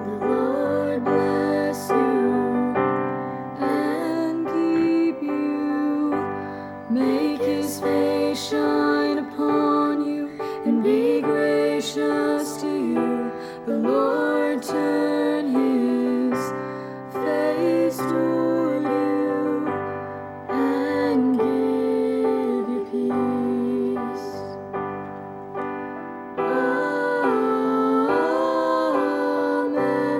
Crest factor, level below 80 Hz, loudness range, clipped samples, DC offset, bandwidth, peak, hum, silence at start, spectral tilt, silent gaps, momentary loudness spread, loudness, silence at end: 14 dB; -64 dBFS; 3 LU; under 0.1%; under 0.1%; 16.5 kHz; -8 dBFS; none; 0 s; -6 dB/octave; none; 10 LU; -23 LUFS; 0 s